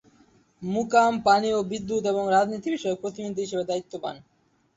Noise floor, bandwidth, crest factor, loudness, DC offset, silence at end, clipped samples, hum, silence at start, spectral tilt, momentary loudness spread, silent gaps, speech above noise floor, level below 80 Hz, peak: -60 dBFS; 8.2 kHz; 18 dB; -25 LUFS; under 0.1%; 0.55 s; under 0.1%; none; 0.6 s; -5 dB/octave; 12 LU; none; 35 dB; -62 dBFS; -6 dBFS